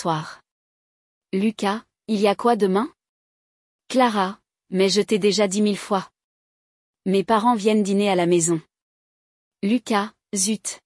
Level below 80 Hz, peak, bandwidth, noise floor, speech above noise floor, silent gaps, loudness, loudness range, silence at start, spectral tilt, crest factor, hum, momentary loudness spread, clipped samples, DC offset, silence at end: -70 dBFS; -6 dBFS; 12 kHz; under -90 dBFS; over 70 dB; 0.51-1.21 s, 3.09-3.79 s, 6.24-6.94 s, 8.82-9.51 s; -21 LUFS; 3 LU; 0 s; -4.5 dB/octave; 16 dB; none; 9 LU; under 0.1%; under 0.1%; 0.1 s